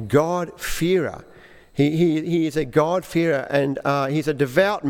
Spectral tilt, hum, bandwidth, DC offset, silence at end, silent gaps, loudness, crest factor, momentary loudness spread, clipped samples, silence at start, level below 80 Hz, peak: -6 dB/octave; none; 18 kHz; under 0.1%; 0 s; none; -21 LUFS; 18 dB; 7 LU; under 0.1%; 0 s; -46 dBFS; -4 dBFS